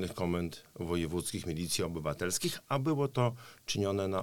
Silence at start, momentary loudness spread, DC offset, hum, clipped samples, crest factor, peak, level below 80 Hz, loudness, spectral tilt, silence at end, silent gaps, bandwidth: 0 s; 5 LU; 0.1%; none; under 0.1%; 18 dB; -14 dBFS; -56 dBFS; -34 LUFS; -5 dB/octave; 0 s; none; 19 kHz